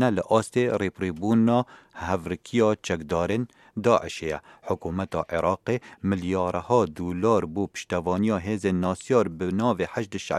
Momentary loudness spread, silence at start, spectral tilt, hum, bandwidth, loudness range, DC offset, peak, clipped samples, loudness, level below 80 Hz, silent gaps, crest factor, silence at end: 8 LU; 0 s; -6.5 dB/octave; none; 13 kHz; 2 LU; under 0.1%; -6 dBFS; under 0.1%; -26 LUFS; -54 dBFS; none; 20 dB; 0 s